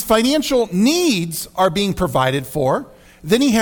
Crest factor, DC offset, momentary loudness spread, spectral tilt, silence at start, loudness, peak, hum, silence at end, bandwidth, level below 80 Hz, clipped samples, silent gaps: 14 dB; under 0.1%; 5 LU; -4.5 dB/octave; 0 s; -17 LUFS; -4 dBFS; none; 0 s; 19 kHz; -42 dBFS; under 0.1%; none